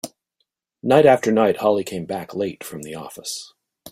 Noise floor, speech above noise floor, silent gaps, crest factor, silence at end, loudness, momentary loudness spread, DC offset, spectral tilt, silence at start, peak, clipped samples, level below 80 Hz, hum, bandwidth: -74 dBFS; 54 dB; none; 18 dB; 0 s; -19 LUFS; 19 LU; under 0.1%; -5 dB/octave; 0.05 s; -2 dBFS; under 0.1%; -62 dBFS; none; 16 kHz